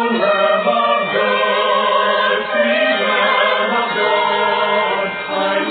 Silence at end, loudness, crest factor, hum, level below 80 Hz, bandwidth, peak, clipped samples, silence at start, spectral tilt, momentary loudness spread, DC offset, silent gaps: 0 s; -15 LUFS; 12 dB; none; -62 dBFS; 4.7 kHz; -2 dBFS; under 0.1%; 0 s; -7.5 dB/octave; 3 LU; under 0.1%; none